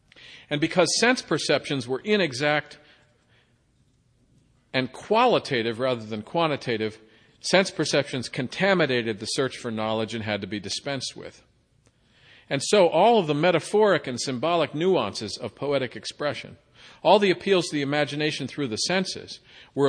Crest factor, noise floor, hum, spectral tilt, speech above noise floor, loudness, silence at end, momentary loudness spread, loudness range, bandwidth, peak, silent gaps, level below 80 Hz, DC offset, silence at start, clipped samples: 20 dB; -64 dBFS; none; -4 dB/octave; 40 dB; -24 LUFS; 0 s; 11 LU; 6 LU; 10.5 kHz; -4 dBFS; none; -66 dBFS; under 0.1%; 0.2 s; under 0.1%